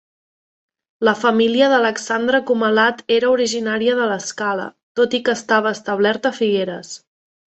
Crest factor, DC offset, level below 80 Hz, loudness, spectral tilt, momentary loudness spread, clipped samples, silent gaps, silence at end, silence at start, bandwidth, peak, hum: 16 dB; under 0.1%; -64 dBFS; -18 LUFS; -3.5 dB/octave; 8 LU; under 0.1%; 4.83-4.95 s; 0.6 s; 1 s; 8.4 kHz; -4 dBFS; none